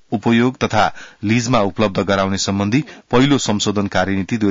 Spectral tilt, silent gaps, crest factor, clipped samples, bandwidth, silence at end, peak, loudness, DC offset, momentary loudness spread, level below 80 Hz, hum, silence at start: -5 dB/octave; none; 12 dB; under 0.1%; 7.8 kHz; 0 s; -4 dBFS; -17 LUFS; under 0.1%; 4 LU; -44 dBFS; none; 0.1 s